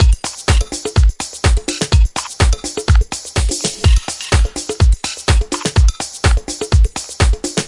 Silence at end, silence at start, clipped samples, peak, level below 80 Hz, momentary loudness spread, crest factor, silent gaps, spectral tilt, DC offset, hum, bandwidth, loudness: 0 s; 0 s; under 0.1%; 0 dBFS; -16 dBFS; 4 LU; 14 dB; none; -4 dB/octave; under 0.1%; none; 11.5 kHz; -16 LUFS